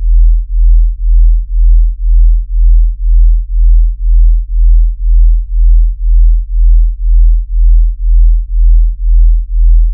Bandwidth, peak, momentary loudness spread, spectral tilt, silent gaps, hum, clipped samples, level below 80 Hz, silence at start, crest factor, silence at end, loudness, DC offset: 0.2 kHz; 0 dBFS; 2 LU; -17.5 dB/octave; none; none; 0.5%; -6 dBFS; 0 s; 6 dB; 0 s; -12 LUFS; under 0.1%